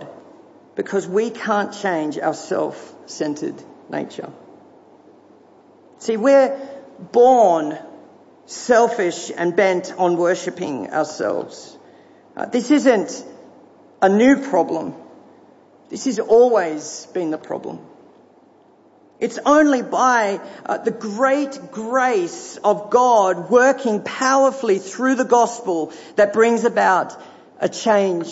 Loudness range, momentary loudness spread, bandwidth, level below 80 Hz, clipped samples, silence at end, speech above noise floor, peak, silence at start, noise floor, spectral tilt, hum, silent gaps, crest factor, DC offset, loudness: 6 LU; 16 LU; 8 kHz; -68 dBFS; under 0.1%; 0 s; 34 dB; -4 dBFS; 0 s; -52 dBFS; -4.5 dB/octave; none; none; 16 dB; under 0.1%; -18 LUFS